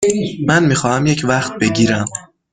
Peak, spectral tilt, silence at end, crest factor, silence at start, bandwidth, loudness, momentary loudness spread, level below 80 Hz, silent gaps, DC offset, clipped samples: -2 dBFS; -5 dB/octave; 0.3 s; 14 dB; 0 s; 9.6 kHz; -15 LUFS; 7 LU; -46 dBFS; none; under 0.1%; under 0.1%